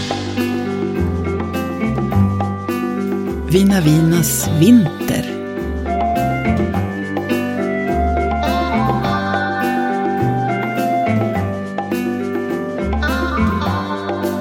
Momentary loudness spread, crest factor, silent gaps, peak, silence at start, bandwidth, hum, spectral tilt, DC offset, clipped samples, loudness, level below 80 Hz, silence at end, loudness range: 8 LU; 16 dB; none; 0 dBFS; 0 s; 17 kHz; none; -6 dB/octave; under 0.1%; under 0.1%; -18 LUFS; -30 dBFS; 0 s; 4 LU